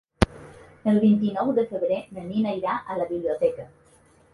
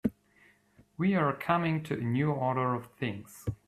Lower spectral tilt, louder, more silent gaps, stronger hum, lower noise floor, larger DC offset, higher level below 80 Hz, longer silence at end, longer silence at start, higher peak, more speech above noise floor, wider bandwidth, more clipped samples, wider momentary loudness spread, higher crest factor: about the same, -7.5 dB/octave vs -7.5 dB/octave; first, -25 LUFS vs -31 LUFS; neither; neither; second, -57 dBFS vs -64 dBFS; neither; first, -42 dBFS vs -60 dBFS; first, 0.65 s vs 0.15 s; first, 0.2 s vs 0.05 s; first, 0 dBFS vs -14 dBFS; about the same, 33 dB vs 34 dB; second, 11.5 kHz vs 14.5 kHz; neither; about the same, 9 LU vs 9 LU; first, 24 dB vs 18 dB